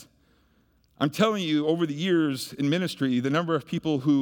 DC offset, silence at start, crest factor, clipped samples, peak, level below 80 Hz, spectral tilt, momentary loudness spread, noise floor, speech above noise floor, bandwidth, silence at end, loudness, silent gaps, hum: under 0.1%; 0 s; 16 dB; under 0.1%; -10 dBFS; -68 dBFS; -6 dB/octave; 5 LU; -64 dBFS; 40 dB; 19 kHz; 0 s; -26 LUFS; none; none